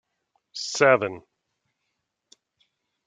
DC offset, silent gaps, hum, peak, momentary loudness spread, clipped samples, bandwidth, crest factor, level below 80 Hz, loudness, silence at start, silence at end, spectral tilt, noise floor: under 0.1%; none; none; -4 dBFS; 21 LU; under 0.1%; 9.4 kHz; 24 dB; -76 dBFS; -22 LUFS; 0.55 s; 1.85 s; -3.5 dB/octave; -79 dBFS